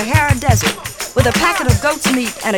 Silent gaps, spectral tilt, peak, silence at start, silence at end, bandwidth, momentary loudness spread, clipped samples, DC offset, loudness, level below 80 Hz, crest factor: none; -4.5 dB/octave; 0 dBFS; 0 s; 0 s; 19 kHz; 6 LU; under 0.1%; under 0.1%; -15 LUFS; -28 dBFS; 14 dB